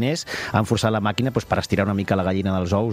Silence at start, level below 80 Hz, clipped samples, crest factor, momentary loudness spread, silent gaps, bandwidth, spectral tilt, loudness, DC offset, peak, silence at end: 0 s; -46 dBFS; under 0.1%; 18 dB; 3 LU; none; 15 kHz; -6 dB/octave; -22 LUFS; under 0.1%; -2 dBFS; 0 s